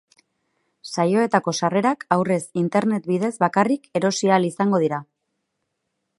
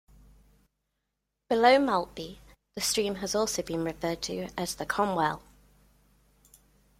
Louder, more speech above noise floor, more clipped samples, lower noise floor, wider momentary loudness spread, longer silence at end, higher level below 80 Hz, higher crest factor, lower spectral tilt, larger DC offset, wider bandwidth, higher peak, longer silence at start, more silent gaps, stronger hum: first, -21 LUFS vs -28 LUFS; about the same, 56 dB vs 55 dB; neither; second, -77 dBFS vs -83 dBFS; second, 5 LU vs 17 LU; second, 1.15 s vs 1.6 s; second, -70 dBFS vs -58 dBFS; about the same, 20 dB vs 22 dB; first, -5.5 dB/octave vs -3.5 dB/octave; neither; second, 11.5 kHz vs 16.5 kHz; first, -2 dBFS vs -8 dBFS; second, 0.85 s vs 1.5 s; neither; second, none vs 50 Hz at -55 dBFS